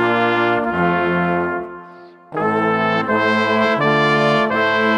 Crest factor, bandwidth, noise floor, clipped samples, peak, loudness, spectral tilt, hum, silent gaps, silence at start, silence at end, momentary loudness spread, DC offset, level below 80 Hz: 14 dB; 10.5 kHz; -40 dBFS; under 0.1%; -2 dBFS; -17 LUFS; -6.5 dB/octave; none; none; 0 s; 0 s; 8 LU; under 0.1%; -54 dBFS